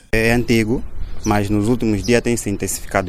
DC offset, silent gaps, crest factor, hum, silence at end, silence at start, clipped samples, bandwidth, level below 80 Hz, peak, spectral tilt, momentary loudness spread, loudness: under 0.1%; none; 18 dB; none; 0 s; 0.15 s; under 0.1%; 16 kHz; -30 dBFS; 0 dBFS; -5 dB/octave; 7 LU; -18 LUFS